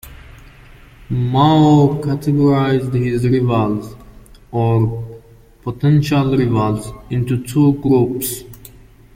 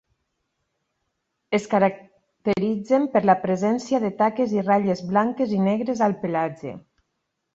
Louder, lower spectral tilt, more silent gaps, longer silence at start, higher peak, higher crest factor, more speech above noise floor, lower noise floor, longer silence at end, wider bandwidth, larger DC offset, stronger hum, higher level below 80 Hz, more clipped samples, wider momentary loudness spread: first, -16 LUFS vs -22 LUFS; about the same, -7.5 dB/octave vs -7 dB/octave; neither; second, 0.05 s vs 1.5 s; first, 0 dBFS vs -4 dBFS; about the same, 16 dB vs 20 dB; second, 29 dB vs 56 dB; second, -43 dBFS vs -77 dBFS; second, 0.6 s vs 0.75 s; first, 16.5 kHz vs 7.8 kHz; neither; neither; first, -40 dBFS vs -64 dBFS; neither; first, 13 LU vs 7 LU